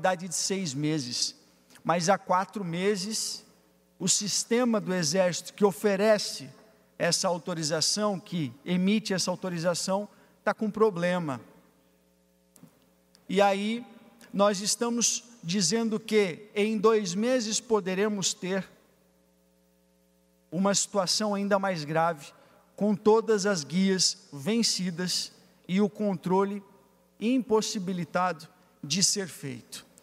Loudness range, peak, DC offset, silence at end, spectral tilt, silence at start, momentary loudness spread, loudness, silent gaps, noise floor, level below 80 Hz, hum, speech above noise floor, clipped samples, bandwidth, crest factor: 4 LU; -10 dBFS; under 0.1%; 0.2 s; -3.5 dB/octave; 0 s; 9 LU; -27 LUFS; none; -66 dBFS; -74 dBFS; none; 38 dB; under 0.1%; 15.5 kHz; 20 dB